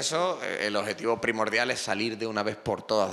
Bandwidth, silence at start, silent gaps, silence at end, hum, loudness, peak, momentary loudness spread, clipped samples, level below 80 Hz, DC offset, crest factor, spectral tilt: 14 kHz; 0 s; none; 0 s; none; -28 LUFS; -10 dBFS; 4 LU; under 0.1%; -66 dBFS; under 0.1%; 18 dB; -3 dB/octave